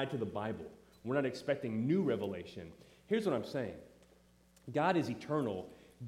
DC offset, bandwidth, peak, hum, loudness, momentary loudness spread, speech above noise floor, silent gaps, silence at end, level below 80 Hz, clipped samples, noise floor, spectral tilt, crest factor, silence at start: under 0.1%; 15.5 kHz; -18 dBFS; none; -36 LUFS; 18 LU; 30 dB; none; 0 s; -72 dBFS; under 0.1%; -66 dBFS; -7 dB/octave; 18 dB; 0 s